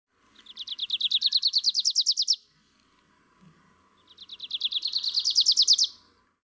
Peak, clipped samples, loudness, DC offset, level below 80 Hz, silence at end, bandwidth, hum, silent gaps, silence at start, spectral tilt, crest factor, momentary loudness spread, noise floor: -12 dBFS; under 0.1%; -22 LUFS; under 0.1%; -78 dBFS; 0.55 s; 8 kHz; none; none; 0.5 s; 4 dB/octave; 18 dB; 15 LU; -65 dBFS